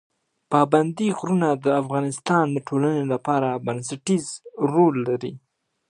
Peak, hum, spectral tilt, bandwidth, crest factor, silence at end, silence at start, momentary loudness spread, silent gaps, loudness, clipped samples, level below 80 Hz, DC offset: -4 dBFS; none; -6.5 dB/octave; 11 kHz; 20 dB; 0.5 s; 0.5 s; 9 LU; none; -22 LUFS; under 0.1%; -70 dBFS; under 0.1%